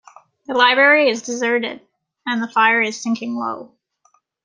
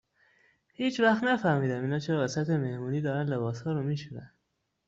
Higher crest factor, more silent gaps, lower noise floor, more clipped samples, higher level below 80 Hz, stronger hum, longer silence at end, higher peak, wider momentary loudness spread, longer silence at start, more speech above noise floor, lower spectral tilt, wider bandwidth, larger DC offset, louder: about the same, 18 dB vs 18 dB; neither; second, -61 dBFS vs -79 dBFS; neither; second, -74 dBFS vs -68 dBFS; neither; first, 0.8 s vs 0.6 s; first, -2 dBFS vs -12 dBFS; first, 16 LU vs 8 LU; second, 0.5 s vs 0.8 s; second, 44 dB vs 51 dB; second, -2.5 dB/octave vs -6.5 dB/octave; first, 10 kHz vs 7.8 kHz; neither; first, -17 LUFS vs -29 LUFS